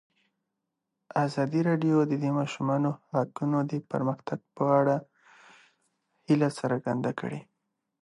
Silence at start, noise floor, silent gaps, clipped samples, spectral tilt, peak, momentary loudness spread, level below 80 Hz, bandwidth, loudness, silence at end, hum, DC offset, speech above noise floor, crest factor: 1.15 s; -84 dBFS; none; under 0.1%; -8 dB/octave; -10 dBFS; 8 LU; -74 dBFS; 11 kHz; -28 LUFS; 0.6 s; none; under 0.1%; 57 dB; 18 dB